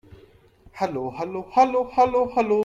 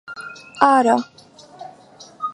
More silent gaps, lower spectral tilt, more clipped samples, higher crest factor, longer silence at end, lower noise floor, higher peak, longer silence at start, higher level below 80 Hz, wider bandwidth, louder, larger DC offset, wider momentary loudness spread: neither; first, -6.5 dB/octave vs -4 dB/octave; neither; about the same, 18 dB vs 20 dB; about the same, 0 s vs 0 s; first, -53 dBFS vs -45 dBFS; second, -6 dBFS vs 0 dBFS; first, 0.75 s vs 0.1 s; first, -54 dBFS vs -66 dBFS; second, 7.6 kHz vs 11.5 kHz; second, -23 LUFS vs -17 LUFS; neither; second, 10 LU vs 25 LU